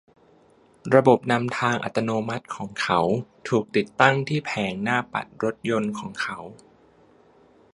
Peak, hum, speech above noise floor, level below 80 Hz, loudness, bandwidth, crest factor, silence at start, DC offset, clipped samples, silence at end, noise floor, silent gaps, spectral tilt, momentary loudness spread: 0 dBFS; none; 33 dB; -62 dBFS; -24 LUFS; 11.5 kHz; 24 dB; 0.85 s; under 0.1%; under 0.1%; 1.2 s; -57 dBFS; none; -6 dB/octave; 12 LU